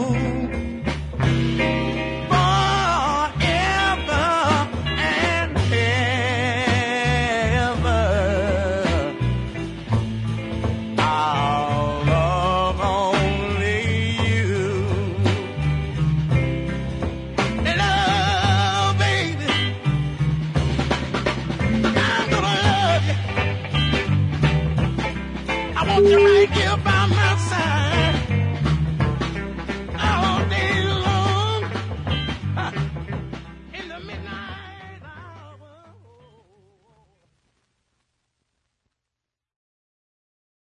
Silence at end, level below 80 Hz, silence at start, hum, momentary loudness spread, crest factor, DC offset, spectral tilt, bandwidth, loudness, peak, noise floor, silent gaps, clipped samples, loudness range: 5.1 s; -36 dBFS; 0 s; none; 9 LU; 16 dB; under 0.1%; -5.5 dB/octave; 10.5 kHz; -21 LUFS; -6 dBFS; -85 dBFS; none; under 0.1%; 6 LU